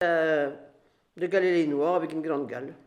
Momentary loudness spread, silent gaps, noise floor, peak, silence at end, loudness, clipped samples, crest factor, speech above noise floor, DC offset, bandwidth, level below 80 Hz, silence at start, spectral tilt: 11 LU; none; -61 dBFS; -12 dBFS; 0.1 s; -27 LUFS; under 0.1%; 16 dB; 34 dB; under 0.1%; 10.5 kHz; -78 dBFS; 0 s; -6.5 dB/octave